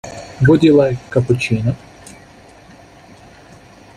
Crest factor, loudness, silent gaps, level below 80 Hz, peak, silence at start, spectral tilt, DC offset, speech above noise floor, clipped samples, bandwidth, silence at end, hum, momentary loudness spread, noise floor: 16 dB; -14 LUFS; none; -44 dBFS; -2 dBFS; 0.05 s; -7.5 dB/octave; under 0.1%; 29 dB; under 0.1%; 10.5 kHz; 1.85 s; none; 14 LU; -43 dBFS